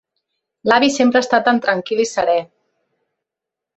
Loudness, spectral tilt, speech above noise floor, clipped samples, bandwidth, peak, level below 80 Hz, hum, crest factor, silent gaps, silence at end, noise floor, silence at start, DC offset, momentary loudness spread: -16 LUFS; -3.5 dB/octave; 69 dB; under 0.1%; 8.4 kHz; -2 dBFS; -60 dBFS; none; 18 dB; none; 1.35 s; -84 dBFS; 0.65 s; under 0.1%; 6 LU